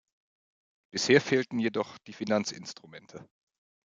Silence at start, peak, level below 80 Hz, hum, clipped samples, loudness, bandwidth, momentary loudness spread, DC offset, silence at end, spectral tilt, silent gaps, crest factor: 0.95 s; -6 dBFS; -76 dBFS; none; under 0.1%; -28 LUFS; 9.2 kHz; 22 LU; under 0.1%; 0.75 s; -4 dB/octave; none; 24 dB